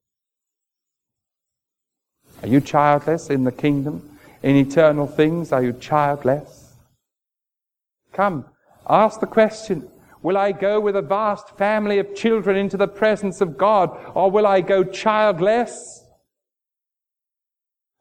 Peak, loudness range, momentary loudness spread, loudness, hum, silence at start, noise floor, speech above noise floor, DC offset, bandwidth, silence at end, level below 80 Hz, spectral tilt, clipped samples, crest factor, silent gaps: -2 dBFS; 5 LU; 11 LU; -19 LUFS; none; 2.4 s; -87 dBFS; 69 dB; under 0.1%; 15.5 kHz; 2.05 s; -56 dBFS; -6.5 dB/octave; under 0.1%; 20 dB; none